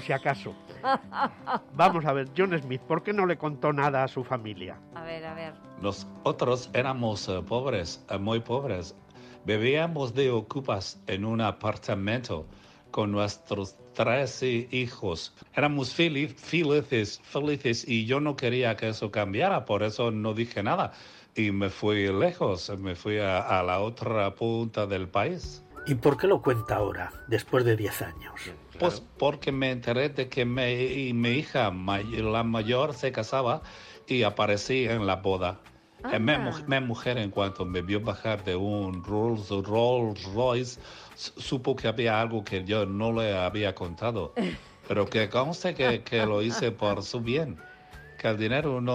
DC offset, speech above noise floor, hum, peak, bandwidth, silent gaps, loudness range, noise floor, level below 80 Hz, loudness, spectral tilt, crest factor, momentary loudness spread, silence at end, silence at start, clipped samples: under 0.1%; 20 dB; none; -10 dBFS; 16 kHz; none; 3 LU; -48 dBFS; -56 dBFS; -28 LUFS; -6 dB/octave; 18 dB; 10 LU; 0 s; 0 s; under 0.1%